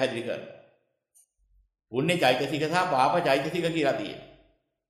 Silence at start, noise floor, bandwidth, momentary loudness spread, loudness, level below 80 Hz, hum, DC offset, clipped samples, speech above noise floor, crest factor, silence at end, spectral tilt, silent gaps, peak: 0 s; -67 dBFS; 14.5 kHz; 14 LU; -26 LUFS; -66 dBFS; none; under 0.1%; under 0.1%; 41 dB; 20 dB; 0.65 s; -5 dB/octave; none; -8 dBFS